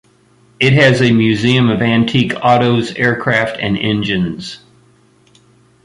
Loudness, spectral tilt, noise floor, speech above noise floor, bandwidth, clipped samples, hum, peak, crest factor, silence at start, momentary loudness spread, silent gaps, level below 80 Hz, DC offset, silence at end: -13 LUFS; -6.5 dB/octave; -51 dBFS; 38 dB; 11 kHz; under 0.1%; none; 0 dBFS; 14 dB; 0.6 s; 8 LU; none; -46 dBFS; under 0.1%; 1.3 s